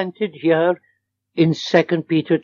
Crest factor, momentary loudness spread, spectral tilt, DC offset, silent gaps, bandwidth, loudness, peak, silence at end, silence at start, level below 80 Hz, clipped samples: 18 dB; 8 LU; -7 dB/octave; under 0.1%; none; 7.2 kHz; -19 LUFS; -2 dBFS; 0.05 s; 0 s; -72 dBFS; under 0.1%